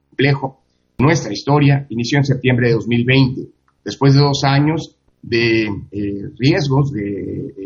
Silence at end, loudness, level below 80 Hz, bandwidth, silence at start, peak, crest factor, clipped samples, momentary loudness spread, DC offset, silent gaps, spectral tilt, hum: 0 s; -16 LUFS; -46 dBFS; 7.2 kHz; 0.2 s; 0 dBFS; 16 dB; under 0.1%; 12 LU; under 0.1%; none; -6.5 dB/octave; none